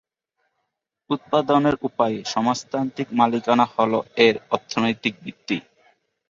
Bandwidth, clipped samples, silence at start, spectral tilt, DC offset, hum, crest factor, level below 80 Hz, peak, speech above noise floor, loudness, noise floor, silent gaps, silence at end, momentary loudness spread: 7.6 kHz; under 0.1%; 1.1 s; -5 dB/octave; under 0.1%; none; 20 dB; -62 dBFS; -2 dBFS; 57 dB; -22 LUFS; -78 dBFS; none; 0.7 s; 10 LU